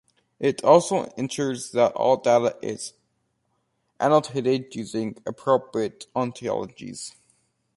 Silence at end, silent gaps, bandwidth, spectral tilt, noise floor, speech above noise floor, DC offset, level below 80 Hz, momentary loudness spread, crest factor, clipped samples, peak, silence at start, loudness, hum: 0.65 s; none; 11.5 kHz; -5 dB/octave; -73 dBFS; 50 dB; under 0.1%; -66 dBFS; 16 LU; 22 dB; under 0.1%; -2 dBFS; 0.4 s; -24 LUFS; none